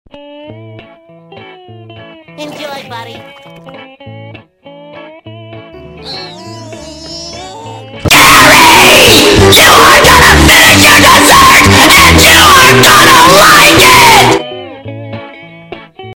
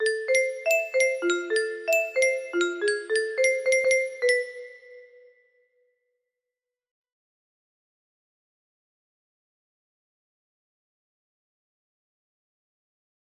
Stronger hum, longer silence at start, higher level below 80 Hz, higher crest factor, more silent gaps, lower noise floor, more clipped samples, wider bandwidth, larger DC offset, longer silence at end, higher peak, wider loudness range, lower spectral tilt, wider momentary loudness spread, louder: neither; first, 0.5 s vs 0 s; first, -24 dBFS vs -78 dBFS; second, 6 dB vs 18 dB; neither; second, -37 dBFS vs -89 dBFS; first, 6% vs under 0.1%; first, over 20 kHz vs 14.5 kHz; neither; second, 0 s vs 8.15 s; first, 0 dBFS vs -10 dBFS; second, 5 LU vs 8 LU; first, -2.5 dB/octave vs -0.5 dB/octave; first, 23 LU vs 5 LU; first, -1 LUFS vs -24 LUFS